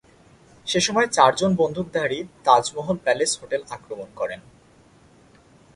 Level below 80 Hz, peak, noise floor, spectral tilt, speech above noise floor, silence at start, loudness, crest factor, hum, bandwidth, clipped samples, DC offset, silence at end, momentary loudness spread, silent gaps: -58 dBFS; 0 dBFS; -54 dBFS; -3.5 dB/octave; 32 dB; 0.65 s; -22 LUFS; 22 dB; none; 11.5 kHz; under 0.1%; under 0.1%; 1.35 s; 17 LU; none